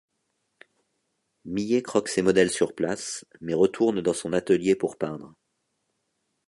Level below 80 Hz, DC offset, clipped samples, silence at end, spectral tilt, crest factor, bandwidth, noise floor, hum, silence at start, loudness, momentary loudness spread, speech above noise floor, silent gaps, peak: -62 dBFS; under 0.1%; under 0.1%; 1.2 s; -5 dB/octave; 20 dB; 11.5 kHz; -76 dBFS; none; 1.45 s; -25 LUFS; 11 LU; 52 dB; none; -6 dBFS